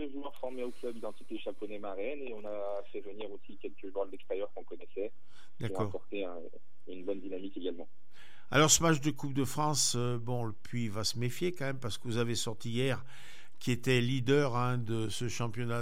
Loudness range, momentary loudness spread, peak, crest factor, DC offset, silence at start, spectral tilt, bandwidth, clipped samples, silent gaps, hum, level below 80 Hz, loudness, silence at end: 11 LU; 16 LU; -10 dBFS; 24 dB; 2%; 0 s; -4 dB/octave; 16 kHz; under 0.1%; none; none; -66 dBFS; -34 LUFS; 0 s